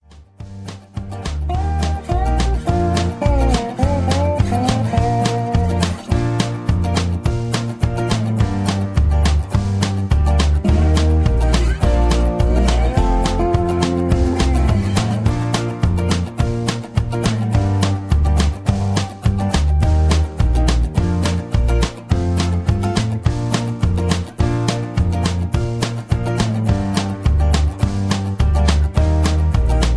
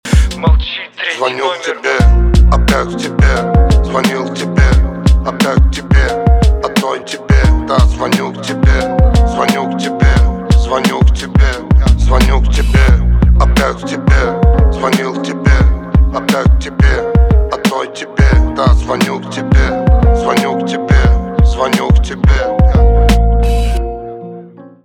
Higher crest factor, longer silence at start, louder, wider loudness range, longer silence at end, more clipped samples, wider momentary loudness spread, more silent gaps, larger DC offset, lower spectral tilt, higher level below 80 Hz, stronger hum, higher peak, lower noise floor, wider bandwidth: first, 16 dB vs 10 dB; about the same, 0.15 s vs 0.05 s; second, -18 LUFS vs -12 LUFS; about the same, 3 LU vs 1 LU; second, 0 s vs 0.2 s; neither; about the same, 5 LU vs 6 LU; neither; neither; about the same, -6.5 dB/octave vs -6.5 dB/octave; second, -20 dBFS vs -12 dBFS; neither; about the same, 0 dBFS vs 0 dBFS; first, -37 dBFS vs -33 dBFS; second, 11 kHz vs 13 kHz